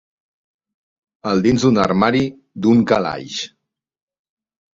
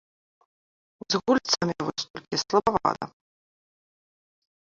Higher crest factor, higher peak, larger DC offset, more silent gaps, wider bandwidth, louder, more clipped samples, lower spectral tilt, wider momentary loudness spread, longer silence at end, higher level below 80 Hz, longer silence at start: about the same, 18 dB vs 22 dB; first, -2 dBFS vs -6 dBFS; neither; second, none vs 2.10-2.14 s; about the same, 7.6 kHz vs 7.6 kHz; first, -17 LUFS vs -26 LUFS; neither; first, -6 dB/octave vs -3.5 dB/octave; about the same, 12 LU vs 11 LU; second, 1.3 s vs 1.6 s; first, -50 dBFS vs -60 dBFS; first, 1.25 s vs 1.1 s